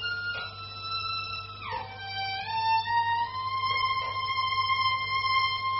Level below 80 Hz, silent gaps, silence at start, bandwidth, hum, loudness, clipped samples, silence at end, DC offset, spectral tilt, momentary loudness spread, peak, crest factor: -58 dBFS; none; 0 s; 6 kHz; 50 Hz at -50 dBFS; -28 LUFS; under 0.1%; 0 s; under 0.1%; 1 dB/octave; 10 LU; -14 dBFS; 16 dB